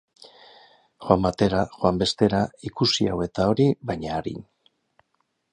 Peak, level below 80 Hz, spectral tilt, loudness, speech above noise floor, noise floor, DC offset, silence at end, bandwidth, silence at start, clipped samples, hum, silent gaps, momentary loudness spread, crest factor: -2 dBFS; -46 dBFS; -6 dB/octave; -23 LUFS; 50 dB; -73 dBFS; under 0.1%; 1.1 s; 11.5 kHz; 1 s; under 0.1%; none; none; 9 LU; 22 dB